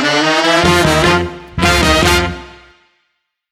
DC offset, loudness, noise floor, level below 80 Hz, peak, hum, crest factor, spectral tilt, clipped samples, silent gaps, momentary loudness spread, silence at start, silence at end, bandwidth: under 0.1%; -12 LUFS; -68 dBFS; -26 dBFS; 0 dBFS; none; 14 dB; -4 dB/octave; under 0.1%; none; 10 LU; 0 s; 1 s; 17.5 kHz